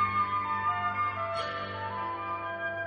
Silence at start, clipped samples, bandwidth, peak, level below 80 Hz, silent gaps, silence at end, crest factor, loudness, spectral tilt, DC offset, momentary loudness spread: 0 s; under 0.1%; 8 kHz; -18 dBFS; -64 dBFS; none; 0 s; 14 dB; -31 LUFS; -2.5 dB/octave; under 0.1%; 6 LU